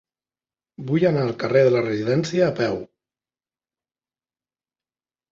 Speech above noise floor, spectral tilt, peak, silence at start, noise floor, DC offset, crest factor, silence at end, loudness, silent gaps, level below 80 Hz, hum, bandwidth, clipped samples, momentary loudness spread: over 70 dB; -7 dB/octave; -6 dBFS; 0.8 s; under -90 dBFS; under 0.1%; 18 dB; 2.45 s; -21 LUFS; none; -60 dBFS; none; 7.8 kHz; under 0.1%; 8 LU